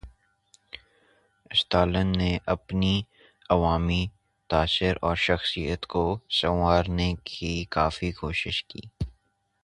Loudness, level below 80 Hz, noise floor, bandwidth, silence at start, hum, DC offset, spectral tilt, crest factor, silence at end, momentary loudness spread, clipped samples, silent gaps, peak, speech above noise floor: -26 LUFS; -38 dBFS; -70 dBFS; 11 kHz; 0.05 s; none; under 0.1%; -6 dB/octave; 22 dB; 0.55 s; 14 LU; under 0.1%; none; -6 dBFS; 44 dB